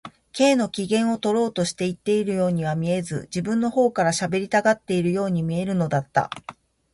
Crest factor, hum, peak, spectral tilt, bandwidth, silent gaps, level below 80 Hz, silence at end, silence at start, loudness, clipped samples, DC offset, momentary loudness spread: 18 dB; none; -4 dBFS; -5.5 dB/octave; 11.5 kHz; none; -58 dBFS; 0.4 s; 0.05 s; -23 LUFS; under 0.1%; under 0.1%; 6 LU